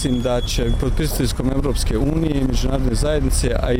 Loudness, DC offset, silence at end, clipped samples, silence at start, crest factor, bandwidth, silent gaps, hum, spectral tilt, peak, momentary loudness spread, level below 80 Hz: -20 LUFS; under 0.1%; 0 s; under 0.1%; 0 s; 12 dB; 16.5 kHz; none; none; -5.5 dB/octave; -6 dBFS; 2 LU; -22 dBFS